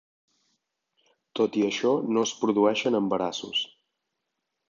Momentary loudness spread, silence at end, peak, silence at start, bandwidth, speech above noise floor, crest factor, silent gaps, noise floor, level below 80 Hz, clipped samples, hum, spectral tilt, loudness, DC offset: 6 LU; 1.05 s; -8 dBFS; 1.35 s; 7.6 kHz; 57 dB; 20 dB; none; -82 dBFS; -74 dBFS; under 0.1%; none; -4 dB/octave; -26 LUFS; under 0.1%